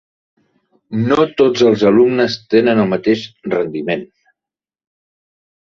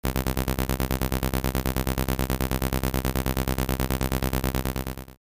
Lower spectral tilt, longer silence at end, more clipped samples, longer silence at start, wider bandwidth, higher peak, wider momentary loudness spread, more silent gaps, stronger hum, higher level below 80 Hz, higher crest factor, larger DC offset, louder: about the same, -6.5 dB/octave vs -5.5 dB/octave; first, 1.75 s vs 0.05 s; neither; first, 0.9 s vs 0.05 s; second, 7.4 kHz vs 16 kHz; first, 0 dBFS vs -8 dBFS; first, 10 LU vs 1 LU; neither; neither; second, -54 dBFS vs -30 dBFS; about the same, 16 dB vs 18 dB; neither; first, -15 LUFS vs -27 LUFS